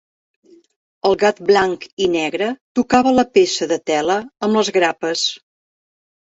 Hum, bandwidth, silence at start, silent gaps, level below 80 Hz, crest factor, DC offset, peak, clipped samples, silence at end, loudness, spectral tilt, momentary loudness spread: none; 8 kHz; 1.05 s; 1.93-1.97 s, 2.61-2.75 s; -56 dBFS; 16 dB; under 0.1%; -2 dBFS; under 0.1%; 1 s; -17 LUFS; -3.5 dB/octave; 7 LU